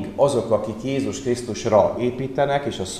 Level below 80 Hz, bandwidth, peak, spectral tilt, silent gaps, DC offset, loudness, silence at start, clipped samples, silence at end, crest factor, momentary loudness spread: -50 dBFS; 14 kHz; -4 dBFS; -5.5 dB/octave; none; 0.2%; -22 LUFS; 0 s; under 0.1%; 0 s; 18 dB; 7 LU